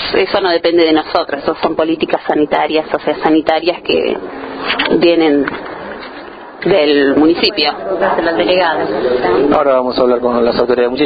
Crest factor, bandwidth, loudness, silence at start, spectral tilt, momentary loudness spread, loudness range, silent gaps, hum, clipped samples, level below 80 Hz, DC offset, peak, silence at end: 12 dB; 5 kHz; -13 LUFS; 0 s; -7.5 dB/octave; 11 LU; 2 LU; none; none; under 0.1%; -44 dBFS; under 0.1%; 0 dBFS; 0 s